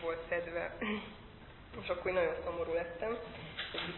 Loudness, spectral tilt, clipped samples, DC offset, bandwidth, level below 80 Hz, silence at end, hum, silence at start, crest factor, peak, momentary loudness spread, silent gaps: -38 LUFS; -2.5 dB/octave; under 0.1%; under 0.1%; 4.2 kHz; -58 dBFS; 0 s; none; 0 s; 20 dB; -20 dBFS; 16 LU; none